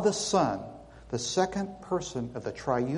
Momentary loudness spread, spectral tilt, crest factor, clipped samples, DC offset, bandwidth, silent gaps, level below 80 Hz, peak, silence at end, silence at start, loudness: 11 LU; -4.5 dB/octave; 20 dB; under 0.1%; under 0.1%; 11.5 kHz; none; -56 dBFS; -10 dBFS; 0 s; 0 s; -30 LUFS